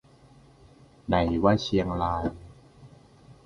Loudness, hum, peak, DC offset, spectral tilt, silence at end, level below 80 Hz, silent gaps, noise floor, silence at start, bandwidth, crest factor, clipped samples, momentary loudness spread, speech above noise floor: -26 LUFS; none; -6 dBFS; under 0.1%; -7 dB/octave; 0.15 s; -44 dBFS; none; -55 dBFS; 1.1 s; 11 kHz; 22 dB; under 0.1%; 15 LU; 30 dB